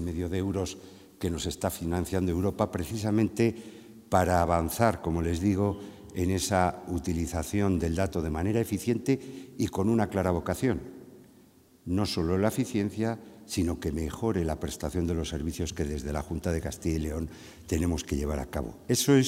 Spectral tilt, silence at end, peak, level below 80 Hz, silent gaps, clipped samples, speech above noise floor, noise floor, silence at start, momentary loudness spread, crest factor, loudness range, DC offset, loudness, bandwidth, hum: -6 dB/octave; 0 s; -6 dBFS; -46 dBFS; none; under 0.1%; 30 dB; -58 dBFS; 0 s; 9 LU; 22 dB; 4 LU; under 0.1%; -29 LUFS; 16 kHz; none